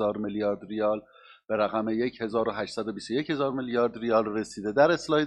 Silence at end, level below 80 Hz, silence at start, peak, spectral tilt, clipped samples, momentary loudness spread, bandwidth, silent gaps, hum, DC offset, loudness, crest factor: 0 s; -62 dBFS; 0 s; -8 dBFS; -5.5 dB/octave; under 0.1%; 9 LU; 11 kHz; none; none; under 0.1%; -28 LUFS; 20 dB